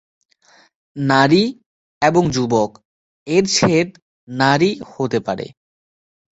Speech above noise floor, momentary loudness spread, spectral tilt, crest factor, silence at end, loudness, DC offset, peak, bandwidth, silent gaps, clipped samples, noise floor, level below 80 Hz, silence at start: over 74 dB; 12 LU; -5 dB/octave; 18 dB; 0.85 s; -17 LUFS; under 0.1%; -2 dBFS; 8.2 kHz; 1.66-2.01 s, 2.85-3.26 s, 4.02-4.27 s; under 0.1%; under -90 dBFS; -52 dBFS; 0.95 s